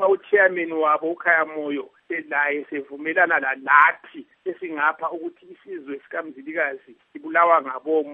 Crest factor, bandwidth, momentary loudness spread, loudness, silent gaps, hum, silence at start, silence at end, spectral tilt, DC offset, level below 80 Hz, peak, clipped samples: 22 dB; 3.9 kHz; 17 LU; -21 LUFS; none; none; 0 s; 0 s; -7 dB/octave; under 0.1%; -84 dBFS; 0 dBFS; under 0.1%